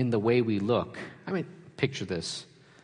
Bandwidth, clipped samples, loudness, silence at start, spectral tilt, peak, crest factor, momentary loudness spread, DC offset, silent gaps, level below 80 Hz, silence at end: 10.5 kHz; under 0.1%; -30 LUFS; 0 s; -6 dB/octave; -12 dBFS; 18 dB; 14 LU; under 0.1%; none; -68 dBFS; 0.4 s